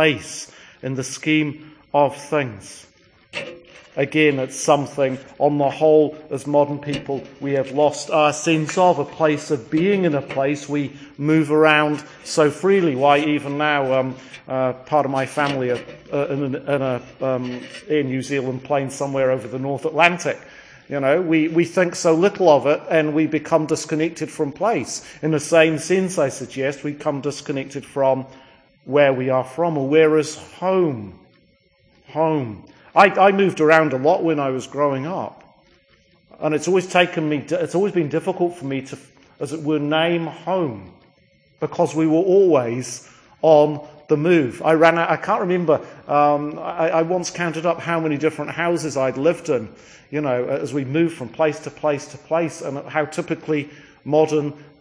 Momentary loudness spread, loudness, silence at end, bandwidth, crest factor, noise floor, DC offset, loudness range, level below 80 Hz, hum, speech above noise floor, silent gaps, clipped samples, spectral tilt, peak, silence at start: 13 LU; -20 LUFS; 0.2 s; 10.5 kHz; 20 dB; -58 dBFS; under 0.1%; 5 LU; -62 dBFS; none; 39 dB; none; under 0.1%; -5.5 dB/octave; 0 dBFS; 0 s